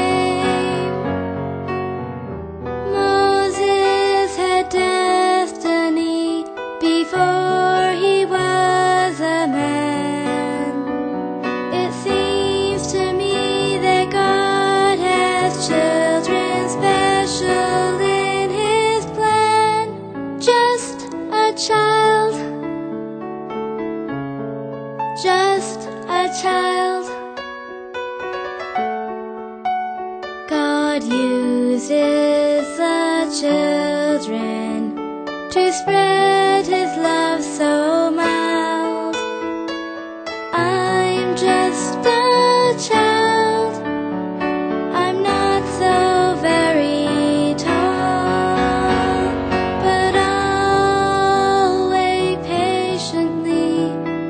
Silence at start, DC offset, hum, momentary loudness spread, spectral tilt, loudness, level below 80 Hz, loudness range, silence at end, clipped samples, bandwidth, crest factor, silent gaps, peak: 0 s; under 0.1%; none; 11 LU; -4.5 dB/octave; -18 LUFS; -46 dBFS; 5 LU; 0 s; under 0.1%; 9.4 kHz; 16 dB; none; -2 dBFS